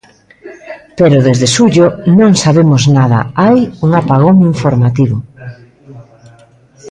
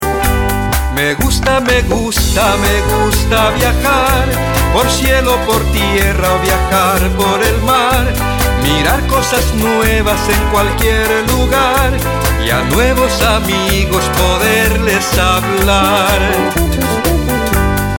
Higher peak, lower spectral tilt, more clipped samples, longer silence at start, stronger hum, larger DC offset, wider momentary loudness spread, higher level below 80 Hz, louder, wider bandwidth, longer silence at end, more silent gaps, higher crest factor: about the same, 0 dBFS vs 0 dBFS; first, -6.5 dB/octave vs -4 dB/octave; neither; first, 0.45 s vs 0 s; neither; second, under 0.1% vs 0.1%; first, 8 LU vs 3 LU; second, -44 dBFS vs -18 dBFS; first, -9 LUFS vs -12 LUFS; second, 11 kHz vs 18 kHz; about the same, 0 s vs 0 s; neither; about the same, 10 dB vs 10 dB